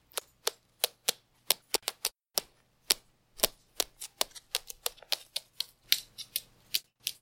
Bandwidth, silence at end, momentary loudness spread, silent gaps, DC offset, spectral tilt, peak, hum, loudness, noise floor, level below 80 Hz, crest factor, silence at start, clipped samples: 17 kHz; 0.1 s; 8 LU; none; under 0.1%; 1.5 dB/octave; 0 dBFS; none; -33 LUFS; -60 dBFS; -64 dBFS; 36 dB; 0.15 s; under 0.1%